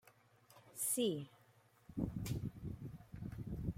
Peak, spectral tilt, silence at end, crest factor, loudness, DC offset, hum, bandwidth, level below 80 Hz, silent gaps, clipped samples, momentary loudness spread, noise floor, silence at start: -26 dBFS; -5 dB/octave; 0 s; 20 dB; -43 LUFS; under 0.1%; none; 16.5 kHz; -58 dBFS; none; under 0.1%; 15 LU; -70 dBFS; 0.05 s